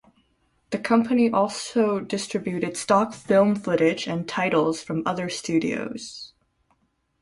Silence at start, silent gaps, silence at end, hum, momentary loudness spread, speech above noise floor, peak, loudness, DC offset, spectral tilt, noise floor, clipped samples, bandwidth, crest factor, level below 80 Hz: 0.7 s; none; 0.95 s; none; 11 LU; 46 dB; -6 dBFS; -23 LUFS; under 0.1%; -5 dB/octave; -69 dBFS; under 0.1%; 11.5 kHz; 20 dB; -62 dBFS